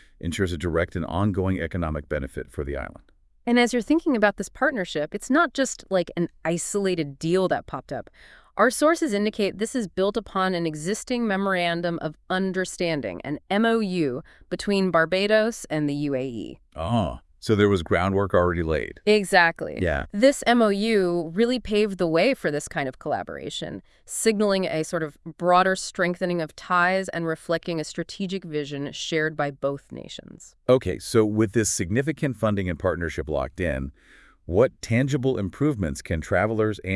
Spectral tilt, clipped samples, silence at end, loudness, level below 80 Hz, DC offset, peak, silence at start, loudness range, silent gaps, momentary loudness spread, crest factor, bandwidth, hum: -5 dB/octave; under 0.1%; 0 s; -24 LUFS; -46 dBFS; under 0.1%; -2 dBFS; 0.25 s; 5 LU; none; 11 LU; 22 dB; 12 kHz; none